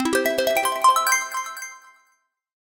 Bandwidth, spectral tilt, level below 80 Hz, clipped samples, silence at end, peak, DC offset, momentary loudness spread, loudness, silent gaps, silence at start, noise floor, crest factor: 19 kHz; -0.5 dB/octave; -60 dBFS; under 0.1%; 0.9 s; -4 dBFS; under 0.1%; 16 LU; -20 LUFS; none; 0 s; -67 dBFS; 18 dB